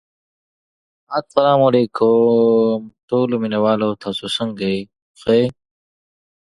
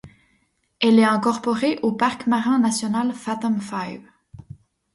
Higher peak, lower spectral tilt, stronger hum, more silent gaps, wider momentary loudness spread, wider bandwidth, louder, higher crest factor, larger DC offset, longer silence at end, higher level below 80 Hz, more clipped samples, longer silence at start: first, 0 dBFS vs -4 dBFS; first, -7 dB/octave vs -4.5 dB/octave; neither; first, 3.03-3.08 s, 5.02-5.14 s vs none; about the same, 12 LU vs 12 LU; about the same, 11.5 kHz vs 11.5 kHz; first, -17 LUFS vs -21 LUFS; about the same, 18 dB vs 18 dB; neither; first, 0.95 s vs 0.6 s; about the same, -58 dBFS vs -60 dBFS; neither; first, 1.1 s vs 0.05 s